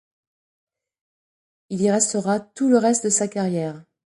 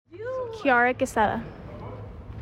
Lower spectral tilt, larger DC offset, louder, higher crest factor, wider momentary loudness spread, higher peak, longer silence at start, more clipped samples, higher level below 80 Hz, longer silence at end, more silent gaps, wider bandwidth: about the same, -4.5 dB/octave vs -5 dB/octave; neither; first, -21 LUFS vs -25 LUFS; about the same, 18 dB vs 18 dB; second, 9 LU vs 19 LU; first, -4 dBFS vs -10 dBFS; first, 1.7 s vs 0.1 s; neither; second, -68 dBFS vs -48 dBFS; first, 0.25 s vs 0 s; neither; second, 11.5 kHz vs 16 kHz